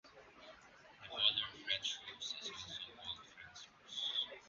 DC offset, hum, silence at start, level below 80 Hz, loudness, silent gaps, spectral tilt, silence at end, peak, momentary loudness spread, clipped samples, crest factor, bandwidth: under 0.1%; none; 0.05 s; -76 dBFS; -40 LUFS; none; 2 dB/octave; 0 s; -18 dBFS; 24 LU; under 0.1%; 26 dB; 7.4 kHz